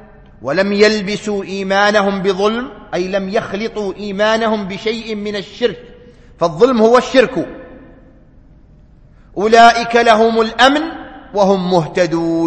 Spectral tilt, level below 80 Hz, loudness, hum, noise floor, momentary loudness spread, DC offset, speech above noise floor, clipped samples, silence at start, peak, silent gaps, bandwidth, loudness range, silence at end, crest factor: -5 dB/octave; -44 dBFS; -14 LUFS; none; -43 dBFS; 13 LU; under 0.1%; 30 dB; under 0.1%; 0.4 s; 0 dBFS; none; 8.8 kHz; 6 LU; 0 s; 14 dB